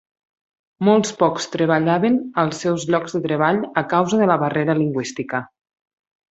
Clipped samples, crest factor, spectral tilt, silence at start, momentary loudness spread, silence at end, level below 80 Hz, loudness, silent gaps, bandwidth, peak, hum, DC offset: under 0.1%; 18 dB; -6 dB/octave; 0.8 s; 7 LU; 0.85 s; -62 dBFS; -19 LUFS; none; 8.2 kHz; -2 dBFS; none; under 0.1%